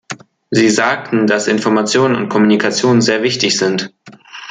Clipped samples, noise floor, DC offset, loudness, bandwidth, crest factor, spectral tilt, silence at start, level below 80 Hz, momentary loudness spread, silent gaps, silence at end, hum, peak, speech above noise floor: under 0.1%; -36 dBFS; under 0.1%; -13 LUFS; 9.6 kHz; 14 dB; -4 dB/octave; 0.1 s; -58 dBFS; 17 LU; none; 0 s; none; 0 dBFS; 23 dB